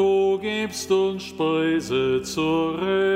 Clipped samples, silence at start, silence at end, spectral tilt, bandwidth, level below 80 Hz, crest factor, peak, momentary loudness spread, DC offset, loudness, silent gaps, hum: under 0.1%; 0 s; 0 s; -5 dB/octave; 16 kHz; -54 dBFS; 12 dB; -10 dBFS; 5 LU; under 0.1%; -23 LUFS; none; none